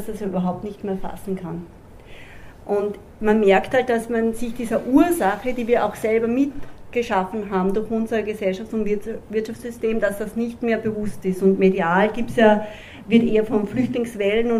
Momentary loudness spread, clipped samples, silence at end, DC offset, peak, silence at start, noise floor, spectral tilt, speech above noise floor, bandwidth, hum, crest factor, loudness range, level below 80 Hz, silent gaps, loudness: 12 LU; under 0.1%; 0 s; under 0.1%; -2 dBFS; 0 s; -41 dBFS; -6.5 dB/octave; 20 dB; 15.5 kHz; none; 20 dB; 5 LU; -44 dBFS; none; -21 LUFS